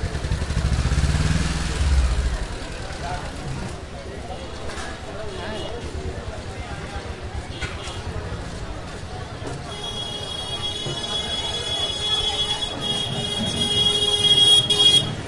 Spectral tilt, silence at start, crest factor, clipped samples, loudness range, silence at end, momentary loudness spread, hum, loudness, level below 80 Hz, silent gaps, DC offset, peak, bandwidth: -3.5 dB/octave; 0 s; 18 dB; under 0.1%; 14 LU; 0 s; 19 LU; none; -21 LUFS; -30 dBFS; none; under 0.1%; -4 dBFS; 11.5 kHz